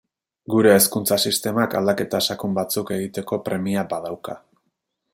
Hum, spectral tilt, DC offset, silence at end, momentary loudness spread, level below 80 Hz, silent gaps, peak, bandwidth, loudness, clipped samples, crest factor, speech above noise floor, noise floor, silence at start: none; -4 dB/octave; under 0.1%; 0.75 s; 13 LU; -64 dBFS; none; -2 dBFS; 17 kHz; -21 LUFS; under 0.1%; 20 dB; 54 dB; -75 dBFS; 0.5 s